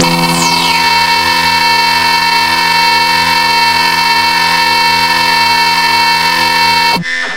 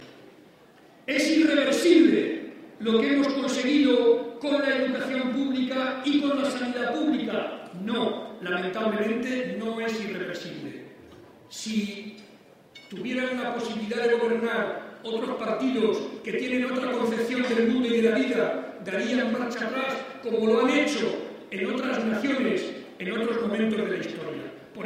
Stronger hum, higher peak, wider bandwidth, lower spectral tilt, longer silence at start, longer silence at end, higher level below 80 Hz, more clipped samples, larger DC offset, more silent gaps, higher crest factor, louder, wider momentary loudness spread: neither; first, 0 dBFS vs -8 dBFS; first, 17 kHz vs 15 kHz; second, -1.5 dB/octave vs -4.5 dB/octave; about the same, 0 s vs 0 s; about the same, 0 s vs 0 s; first, -40 dBFS vs -70 dBFS; neither; first, 0.5% vs under 0.1%; neither; second, 10 dB vs 18 dB; first, -8 LUFS vs -26 LUFS; second, 1 LU vs 14 LU